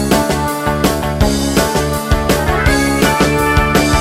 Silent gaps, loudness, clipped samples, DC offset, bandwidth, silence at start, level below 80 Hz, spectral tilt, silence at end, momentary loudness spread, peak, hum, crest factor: none; -14 LUFS; under 0.1%; under 0.1%; 16.5 kHz; 0 s; -22 dBFS; -4.5 dB/octave; 0 s; 4 LU; 0 dBFS; none; 12 dB